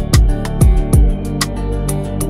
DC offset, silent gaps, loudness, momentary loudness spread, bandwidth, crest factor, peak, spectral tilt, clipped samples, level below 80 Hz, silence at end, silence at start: under 0.1%; none; -16 LUFS; 6 LU; 15.5 kHz; 12 dB; 0 dBFS; -5.5 dB/octave; under 0.1%; -14 dBFS; 0 s; 0 s